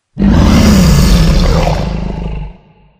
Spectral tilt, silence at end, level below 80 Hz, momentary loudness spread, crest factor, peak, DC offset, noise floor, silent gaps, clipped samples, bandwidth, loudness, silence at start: -6 dB/octave; 0.5 s; -14 dBFS; 15 LU; 10 dB; 0 dBFS; under 0.1%; -38 dBFS; none; 0.6%; 16 kHz; -10 LUFS; 0.15 s